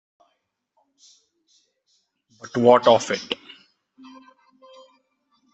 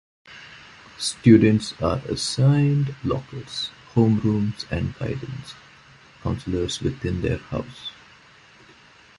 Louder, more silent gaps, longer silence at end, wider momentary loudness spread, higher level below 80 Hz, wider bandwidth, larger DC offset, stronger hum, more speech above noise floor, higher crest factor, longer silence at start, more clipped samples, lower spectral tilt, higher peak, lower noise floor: first, -19 LUFS vs -23 LUFS; neither; first, 2.2 s vs 1.25 s; second, 16 LU vs 22 LU; second, -70 dBFS vs -44 dBFS; second, 8.2 kHz vs 11.5 kHz; neither; neither; first, 56 dB vs 29 dB; about the same, 24 dB vs 20 dB; first, 2.45 s vs 0.3 s; neither; second, -4.5 dB/octave vs -6 dB/octave; about the same, 0 dBFS vs -2 dBFS; first, -74 dBFS vs -51 dBFS